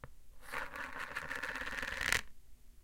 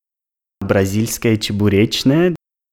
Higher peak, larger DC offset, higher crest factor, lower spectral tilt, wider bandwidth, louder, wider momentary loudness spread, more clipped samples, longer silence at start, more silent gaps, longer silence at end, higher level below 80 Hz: second, -8 dBFS vs -2 dBFS; neither; first, 34 dB vs 14 dB; second, -1.5 dB/octave vs -5.5 dB/octave; about the same, 17 kHz vs 18.5 kHz; second, -39 LUFS vs -16 LUFS; first, 11 LU vs 5 LU; neither; second, 0 s vs 0.6 s; neither; second, 0 s vs 0.35 s; second, -56 dBFS vs -44 dBFS